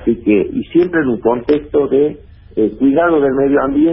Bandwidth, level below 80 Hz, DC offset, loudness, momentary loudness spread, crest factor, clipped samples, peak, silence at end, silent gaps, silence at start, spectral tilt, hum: 5.6 kHz; -40 dBFS; under 0.1%; -14 LUFS; 5 LU; 12 dB; under 0.1%; -2 dBFS; 0 s; none; 0 s; -12.5 dB/octave; none